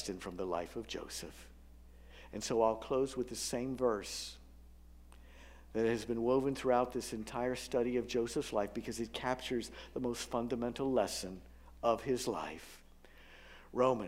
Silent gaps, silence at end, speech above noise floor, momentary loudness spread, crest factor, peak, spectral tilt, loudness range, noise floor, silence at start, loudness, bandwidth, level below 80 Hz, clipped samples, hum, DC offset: none; 0 s; 22 dB; 18 LU; 20 dB; -18 dBFS; -4.5 dB/octave; 3 LU; -58 dBFS; 0 s; -37 LUFS; 16 kHz; -58 dBFS; under 0.1%; none; under 0.1%